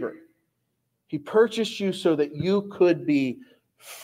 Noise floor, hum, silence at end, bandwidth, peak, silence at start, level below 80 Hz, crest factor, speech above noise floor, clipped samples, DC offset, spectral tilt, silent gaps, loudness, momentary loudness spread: -76 dBFS; none; 0 s; 16 kHz; -8 dBFS; 0 s; -70 dBFS; 18 dB; 53 dB; under 0.1%; under 0.1%; -6 dB/octave; none; -24 LUFS; 14 LU